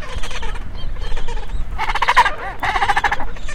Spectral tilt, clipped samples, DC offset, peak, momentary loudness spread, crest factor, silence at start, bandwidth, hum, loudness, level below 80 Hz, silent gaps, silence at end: -3 dB/octave; under 0.1%; under 0.1%; 0 dBFS; 15 LU; 16 dB; 0 s; 10.5 kHz; none; -20 LUFS; -24 dBFS; none; 0 s